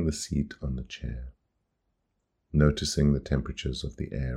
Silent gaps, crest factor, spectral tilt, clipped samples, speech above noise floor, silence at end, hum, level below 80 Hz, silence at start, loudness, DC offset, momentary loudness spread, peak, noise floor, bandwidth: none; 22 dB; -6 dB/octave; under 0.1%; 50 dB; 0 s; none; -38 dBFS; 0 s; -29 LUFS; under 0.1%; 13 LU; -8 dBFS; -78 dBFS; 13 kHz